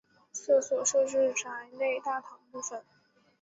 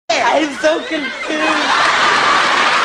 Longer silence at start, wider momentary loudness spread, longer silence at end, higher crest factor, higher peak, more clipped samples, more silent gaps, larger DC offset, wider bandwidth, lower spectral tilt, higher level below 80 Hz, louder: first, 0.35 s vs 0.1 s; first, 15 LU vs 8 LU; first, 0.6 s vs 0 s; first, 18 dB vs 12 dB; second, -14 dBFS vs -2 dBFS; neither; neither; neither; second, 8 kHz vs 11 kHz; about the same, -1 dB/octave vs -1.5 dB/octave; second, -80 dBFS vs -54 dBFS; second, -30 LUFS vs -13 LUFS